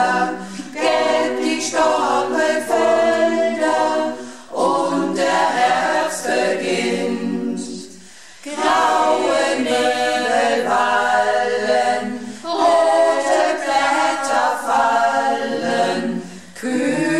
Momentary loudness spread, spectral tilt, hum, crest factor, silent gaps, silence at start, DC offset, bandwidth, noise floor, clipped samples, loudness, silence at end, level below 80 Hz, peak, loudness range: 10 LU; -3.5 dB/octave; none; 12 dB; none; 0 s; 0.5%; 13.5 kHz; -42 dBFS; under 0.1%; -18 LUFS; 0 s; -62 dBFS; -6 dBFS; 3 LU